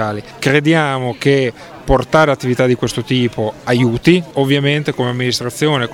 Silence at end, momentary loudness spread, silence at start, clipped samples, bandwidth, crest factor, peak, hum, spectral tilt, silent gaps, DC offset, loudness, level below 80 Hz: 0 s; 6 LU; 0 s; under 0.1%; 16.5 kHz; 14 dB; 0 dBFS; none; -5.5 dB/octave; none; under 0.1%; -15 LUFS; -34 dBFS